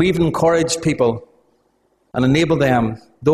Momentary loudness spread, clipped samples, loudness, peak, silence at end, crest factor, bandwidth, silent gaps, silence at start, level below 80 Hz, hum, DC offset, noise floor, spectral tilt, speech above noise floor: 8 LU; under 0.1%; -17 LUFS; -2 dBFS; 0 s; 16 dB; 14 kHz; none; 0 s; -44 dBFS; none; under 0.1%; -62 dBFS; -5.5 dB/octave; 46 dB